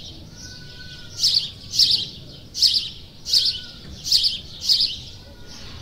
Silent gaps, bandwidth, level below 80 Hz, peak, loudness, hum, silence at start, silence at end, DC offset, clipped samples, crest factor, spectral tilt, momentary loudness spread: none; 16 kHz; -48 dBFS; -2 dBFS; -18 LUFS; none; 0 s; 0 s; under 0.1%; under 0.1%; 22 dB; -0.5 dB/octave; 22 LU